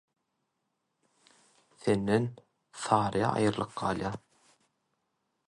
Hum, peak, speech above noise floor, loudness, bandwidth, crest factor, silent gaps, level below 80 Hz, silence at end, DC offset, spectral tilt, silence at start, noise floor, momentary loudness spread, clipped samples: none; -10 dBFS; 52 dB; -30 LUFS; 11.5 kHz; 24 dB; none; -62 dBFS; 1.3 s; under 0.1%; -6 dB/octave; 1.85 s; -81 dBFS; 12 LU; under 0.1%